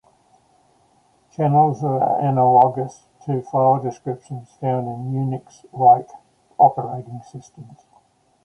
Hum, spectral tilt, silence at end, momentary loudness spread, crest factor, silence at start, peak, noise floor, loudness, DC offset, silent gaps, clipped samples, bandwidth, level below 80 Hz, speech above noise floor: none; -9.5 dB/octave; 0.7 s; 21 LU; 20 dB; 1.4 s; -2 dBFS; -59 dBFS; -19 LUFS; under 0.1%; none; under 0.1%; 8.6 kHz; -64 dBFS; 40 dB